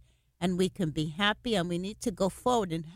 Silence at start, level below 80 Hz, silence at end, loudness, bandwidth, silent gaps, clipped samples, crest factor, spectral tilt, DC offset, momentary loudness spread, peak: 0.4 s; -54 dBFS; 0 s; -30 LUFS; 16 kHz; none; under 0.1%; 18 dB; -5 dB/octave; under 0.1%; 6 LU; -12 dBFS